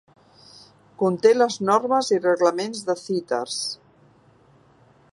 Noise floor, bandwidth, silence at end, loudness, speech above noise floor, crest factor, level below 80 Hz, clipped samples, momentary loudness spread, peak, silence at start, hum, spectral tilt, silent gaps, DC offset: -56 dBFS; 11.5 kHz; 1.35 s; -22 LUFS; 35 dB; 20 dB; -74 dBFS; under 0.1%; 10 LU; -4 dBFS; 1 s; none; -4 dB/octave; none; under 0.1%